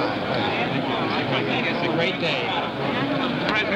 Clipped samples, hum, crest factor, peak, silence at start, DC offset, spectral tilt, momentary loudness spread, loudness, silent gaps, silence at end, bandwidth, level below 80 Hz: under 0.1%; none; 16 dB; -6 dBFS; 0 s; under 0.1%; -6 dB/octave; 2 LU; -23 LUFS; none; 0 s; 15 kHz; -54 dBFS